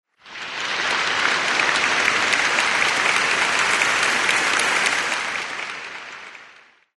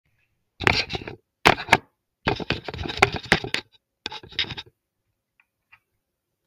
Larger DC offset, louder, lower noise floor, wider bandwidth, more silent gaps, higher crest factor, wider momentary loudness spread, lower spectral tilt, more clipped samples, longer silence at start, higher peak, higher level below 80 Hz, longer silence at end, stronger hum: neither; first, -18 LUFS vs -23 LUFS; second, -50 dBFS vs -79 dBFS; second, 11.5 kHz vs 18 kHz; neither; second, 20 dB vs 28 dB; about the same, 15 LU vs 16 LU; second, 0 dB/octave vs -4 dB/octave; neither; second, 0.25 s vs 0.6 s; about the same, -2 dBFS vs 0 dBFS; second, -60 dBFS vs -46 dBFS; second, 0.5 s vs 1.85 s; neither